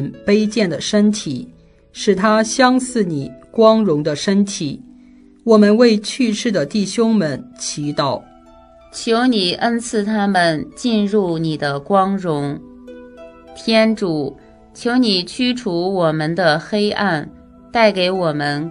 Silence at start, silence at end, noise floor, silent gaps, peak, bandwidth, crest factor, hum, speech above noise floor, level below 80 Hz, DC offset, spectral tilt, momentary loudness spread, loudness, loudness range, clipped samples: 0 s; 0 s; -45 dBFS; none; 0 dBFS; 11 kHz; 18 dB; none; 29 dB; -52 dBFS; under 0.1%; -5 dB/octave; 12 LU; -17 LUFS; 4 LU; under 0.1%